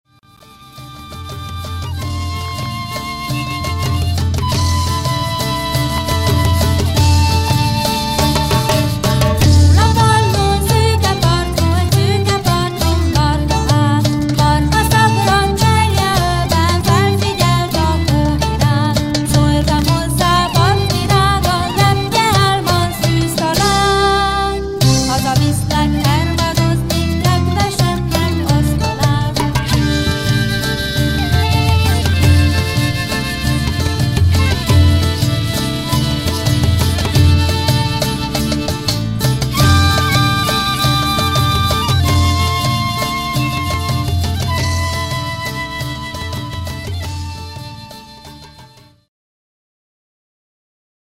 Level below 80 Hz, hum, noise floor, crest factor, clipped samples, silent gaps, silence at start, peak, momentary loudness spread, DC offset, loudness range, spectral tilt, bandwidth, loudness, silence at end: -24 dBFS; none; -45 dBFS; 12 dB; under 0.1%; none; 0.6 s; -2 dBFS; 10 LU; under 0.1%; 7 LU; -5 dB/octave; 16.5 kHz; -14 LUFS; 2.4 s